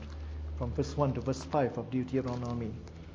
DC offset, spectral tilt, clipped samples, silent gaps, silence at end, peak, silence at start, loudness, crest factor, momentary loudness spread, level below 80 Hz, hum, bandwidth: under 0.1%; -7.5 dB/octave; under 0.1%; none; 0 s; -14 dBFS; 0 s; -34 LUFS; 20 dB; 10 LU; -44 dBFS; none; 8 kHz